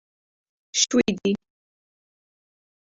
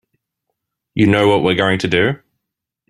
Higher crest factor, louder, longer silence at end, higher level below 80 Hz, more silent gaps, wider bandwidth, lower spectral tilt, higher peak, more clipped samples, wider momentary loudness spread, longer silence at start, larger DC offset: first, 22 dB vs 16 dB; second, -23 LUFS vs -15 LUFS; first, 1.55 s vs 0.75 s; second, -62 dBFS vs -50 dBFS; neither; second, 8 kHz vs 12.5 kHz; second, -3 dB/octave vs -6.5 dB/octave; second, -6 dBFS vs 0 dBFS; neither; second, 8 LU vs 11 LU; second, 0.75 s vs 0.95 s; neither